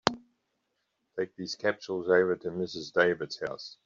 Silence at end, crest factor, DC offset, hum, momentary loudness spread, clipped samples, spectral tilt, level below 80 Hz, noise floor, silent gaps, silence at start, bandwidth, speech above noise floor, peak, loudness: 0.15 s; 28 dB; under 0.1%; none; 11 LU; under 0.1%; -3 dB/octave; -70 dBFS; -79 dBFS; none; 0.05 s; 7.6 kHz; 49 dB; -2 dBFS; -30 LUFS